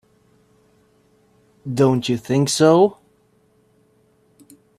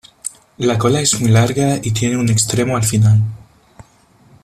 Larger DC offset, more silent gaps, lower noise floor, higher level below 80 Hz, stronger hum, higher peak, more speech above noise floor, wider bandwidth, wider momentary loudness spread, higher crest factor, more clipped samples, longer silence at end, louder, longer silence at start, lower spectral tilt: neither; neither; first, -59 dBFS vs -50 dBFS; second, -60 dBFS vs -44 dBFS; neither; about the same, -2 dBFS vs -2 dBFS; first, 43 dB vs 36 dB; about the same, 15 kHz vs 14 kHz; about the same, 11 LU vs 10 LU; first, 20 dB vs 14 dB; neither; first, 1.85 s vs 1.05 s; about the same, -17 LUFS vs -15 LUFS; first, 1.65 s vs 0.25 s; about the same, -5.5 dB/octave vs -5 dB/octave